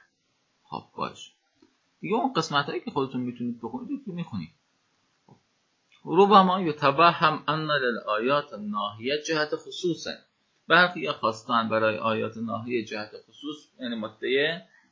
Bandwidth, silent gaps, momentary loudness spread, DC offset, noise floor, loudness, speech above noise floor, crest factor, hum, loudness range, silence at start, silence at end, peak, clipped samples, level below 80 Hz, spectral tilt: 7.6 kHz; none; 19 LU; under 0.1%; -72 dBFS; -25 LUFS; 46 dB; 22 dB; none; 9 LU; 0.7 s; 0.3 s; -4 dBFS; under 0.1%; -70 dBFS; -5 dB/octave